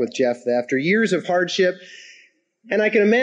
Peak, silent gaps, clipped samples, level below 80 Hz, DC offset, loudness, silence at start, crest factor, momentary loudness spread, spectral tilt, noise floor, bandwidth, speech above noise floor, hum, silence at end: -6 dBFS; none; under 0.1%; -72 dBFS; under 0.1%; -20 LUFS; 0 s; 16 dB; 7 LU; -5 dB/octave; -55 dBFS; 9.6 kHz; 36 dB; none; 0 s